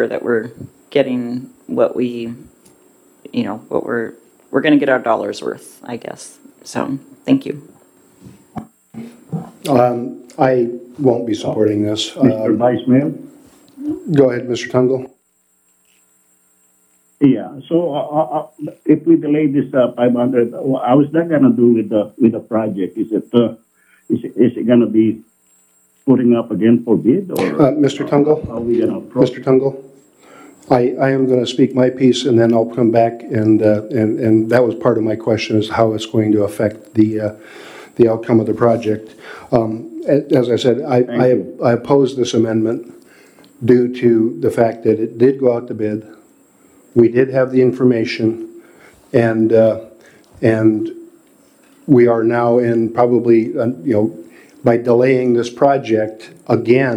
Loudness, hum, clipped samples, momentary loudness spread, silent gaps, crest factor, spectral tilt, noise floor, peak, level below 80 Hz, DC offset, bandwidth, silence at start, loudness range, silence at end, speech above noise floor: -15 LUFS; none; under 0.1%; 13 LU; none; 16 dB; -7 dB/octave; -60 dBFS; 0 dBFS; -56 dBFS; under 0.1%; 13 kHz; 0 s; 6 LU; 0 s; 46 dB